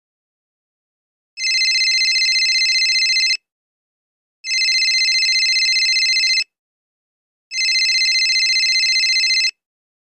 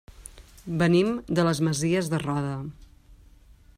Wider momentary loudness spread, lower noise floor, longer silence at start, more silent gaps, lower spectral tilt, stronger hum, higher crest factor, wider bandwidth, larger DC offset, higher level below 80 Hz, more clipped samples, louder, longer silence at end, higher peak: second, 6 LU vs 23 LU; first, under -90 dBFS vs -53 dBFS; first, 1.35 s vs 0.2 s; first, 3.52-4.44 s, 6.59-7.51 s vs none; second, 7.5 dB/octave vs -6 dB/octave; neither; about the same, 12 dB vs 16 dB; about the same, 15 kHz vs 15.5 kHz; neither; second, -86 dBFS vs -52 dBFS; neither; first, -14 LUFS vs -25 LUFS; about the same, 0.6 s vs 0.65 s; about the same, -8 dBFS vs -10 dBFS